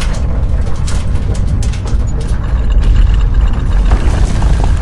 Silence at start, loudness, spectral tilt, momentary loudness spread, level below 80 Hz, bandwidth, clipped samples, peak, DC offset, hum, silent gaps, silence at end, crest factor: 0 s; -15 LUFS; -6.5 dB/octave; 5 LU; -12 dBFS; 11 kHz; under 0.1%; 0 dBFS; 6%; none; none; 0 s; 10 dB